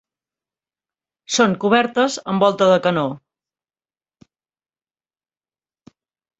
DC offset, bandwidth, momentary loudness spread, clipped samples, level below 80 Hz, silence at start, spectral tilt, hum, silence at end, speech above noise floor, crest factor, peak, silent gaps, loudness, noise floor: under 0.1%; 8.2 kHz; 8 LU; under 0.1%; -64 dBFS; 1.3 s; -4.5 dB/octave; none; 3.2 s; over 73 dB; 20 dB; -2 dBFS; none; -17 LUFS; under -90 dBFS